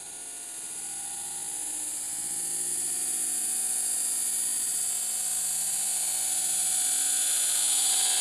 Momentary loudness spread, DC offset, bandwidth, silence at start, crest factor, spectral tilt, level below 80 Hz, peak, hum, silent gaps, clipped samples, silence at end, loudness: 10 LU; under 0.1%; 16 kHz; 0 s; 16 dB; 2 dB/octave; -68 dBFS; -14 dBFS; none; none; under 0.1%; 0 s; -26 LUFS